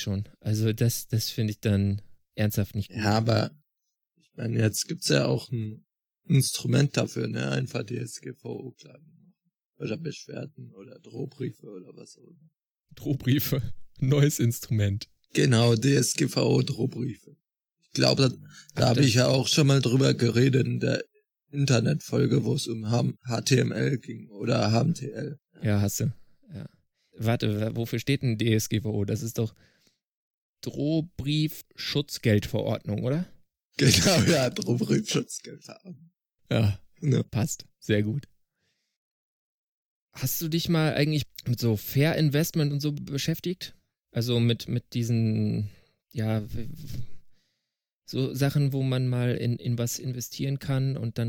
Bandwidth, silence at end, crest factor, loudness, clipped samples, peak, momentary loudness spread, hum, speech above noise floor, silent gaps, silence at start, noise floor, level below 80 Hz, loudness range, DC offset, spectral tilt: over 20 kHz; 0 s; 24 dB; -26 LUFS; under 0.1%; -4 dBFS; 16 LU; none; 58 dB; 9.65-9.73 s, 12.70-12.74 s, 30.05-30.54 s, 33.65-33.70 s, 38.97-40.09 s, 47.93-48.02 s; 0 s; -84 dBFS; -58 dBFS; 8 LU; under 0.1%; -5.5 dB/octave